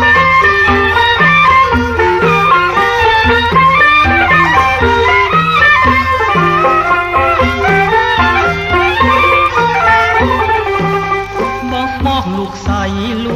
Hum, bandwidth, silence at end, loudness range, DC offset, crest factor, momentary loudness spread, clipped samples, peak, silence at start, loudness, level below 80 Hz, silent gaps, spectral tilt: none; 16 kHz; 0 s; 4 LU; under 0.1%; 10 dB; 9 LU; under 0.1%; 0 dBFS; 0 s; -9 LUFS; -28 dBFS; none; -5.5 dB/octave